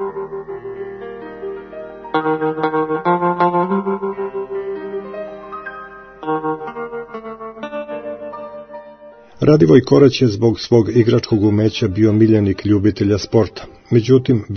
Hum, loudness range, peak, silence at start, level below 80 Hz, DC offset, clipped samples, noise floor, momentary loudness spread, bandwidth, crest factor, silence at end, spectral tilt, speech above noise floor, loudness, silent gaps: none; 13 LU; 0 dBFS; 0 s; -50 dBFS; under 0.1%; under 0.1%; -41 dBFS; 18 LU; 6.6 kHz; 16 dB; 0 s; -7.5 dB/octave; 27 dB; -16 LUFS; none